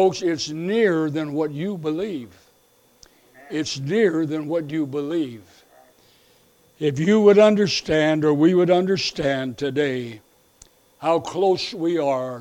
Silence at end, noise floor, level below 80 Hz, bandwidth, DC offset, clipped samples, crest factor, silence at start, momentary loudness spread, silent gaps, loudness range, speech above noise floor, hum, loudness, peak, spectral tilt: 0 s; -59 dBFS; -58 dBFS; 15.5 kHz; under 0.1%; under 0.1%; 18 dB; 0 s; 11 LU; none; 8 LU; 38 dB; none; -21 LUFS; -2 dBFS; -5.5 dB/octave